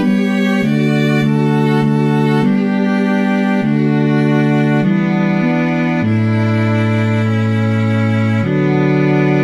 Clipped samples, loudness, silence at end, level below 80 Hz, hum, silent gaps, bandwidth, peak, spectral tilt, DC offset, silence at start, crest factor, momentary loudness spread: under 0.1%; -14 LUFS; 0 s; -58 dBFS; none; none; 11 kHz; -2 dBFS; -8 dB/octave; 0.4%; 0 s; 10 dB; 2 LU